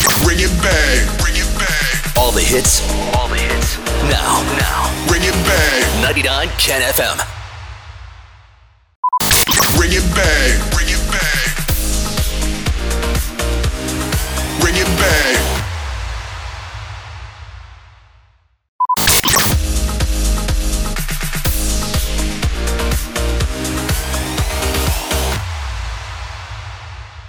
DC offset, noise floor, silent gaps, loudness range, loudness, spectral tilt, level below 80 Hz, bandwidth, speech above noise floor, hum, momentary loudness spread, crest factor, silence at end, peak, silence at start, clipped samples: under 0.1%; -53 dBFS; 8.96-9.03 s, 18.68-18.79 s; 5 LU; -15 LUFS; -3 dB/octave; -20 dBFS; over 20 kHz; 39 dB; none; 16 LU; 16 dB; 0 s; -2 dBFS; 0 s; under 0.1%